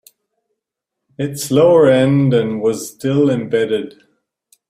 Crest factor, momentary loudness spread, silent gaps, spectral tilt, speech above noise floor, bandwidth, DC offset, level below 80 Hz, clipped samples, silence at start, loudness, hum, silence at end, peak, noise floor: 16 dB; 13 LU; none; -6.5 dB/octave; 66 dB; 15.5 kHz; under 0.1%; -56 dBFS; under 0.1%; 1.2 s; -15 LUFS; none; 0.8 s; 0 dBFS; -80 dBFS